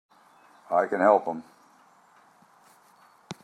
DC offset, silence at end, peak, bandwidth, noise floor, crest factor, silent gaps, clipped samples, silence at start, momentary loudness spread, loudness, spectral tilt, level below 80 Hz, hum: under 0.1%; 0.1 s; -6 dBFS; 11.5 kHz; -59 dBFS; 24 dB; none; under 0.1%; 0.7 s; 18 LU; -24 LUFS; -6 dB/octave; -80 dBFS; none